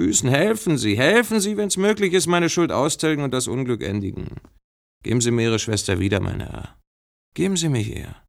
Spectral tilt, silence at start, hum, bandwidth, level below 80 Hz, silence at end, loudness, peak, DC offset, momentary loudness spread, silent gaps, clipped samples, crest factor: -4.5 dB/octave; 0 s; none; 16.5 kHz; -48 dBFS; 0.15 s; -21 LUFS; -4 dBFS; under 0.1%; 13 LU; 4.64-5.01 s, 6.87-7.32 s; under 0.1%; 18 dB